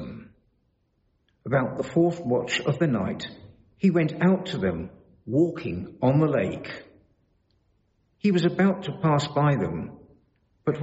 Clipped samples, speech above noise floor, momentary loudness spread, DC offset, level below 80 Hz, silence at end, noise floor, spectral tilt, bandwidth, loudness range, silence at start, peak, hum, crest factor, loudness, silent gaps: under 0.1%; 46 dB; 16 LU; under 0.1%; -56 dBFS; 0 s; -70 dBFS; -6.5 dB/octave; 8 kHz; 2 LU; 0 s; -10 dBFS; none; 16 dB; -25 LUFS; none